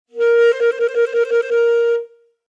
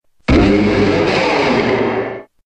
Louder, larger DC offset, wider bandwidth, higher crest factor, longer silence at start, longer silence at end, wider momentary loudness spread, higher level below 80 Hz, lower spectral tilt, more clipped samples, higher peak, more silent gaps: about the same, -16 LUFS vs -14 LUFS; neither; second, 7.4 kHz vs 9.2 kHz; about the same, 10 dB vs 14 dB; second, 0.15 s vs 0.3 s; first, 0.4 s vs 0.25 s; about the same, 5 LU vs 7 LU; second, under -90 dBFS vs -28 dBFS; second, -0.5 dB/octave vs -6.5 dB/octave; neither; second, -6 dBFS vs 0 dBFS; neither